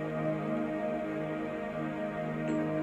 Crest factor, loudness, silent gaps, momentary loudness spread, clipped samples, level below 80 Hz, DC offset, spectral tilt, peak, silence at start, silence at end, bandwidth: 12 dB; -34 LUFS; none; 3 LU; under 0.1%; -62 dBFS; under 0.1%; -8 dB/octave; -20 dBFS; 0 s; 0 s; 9.2 kHz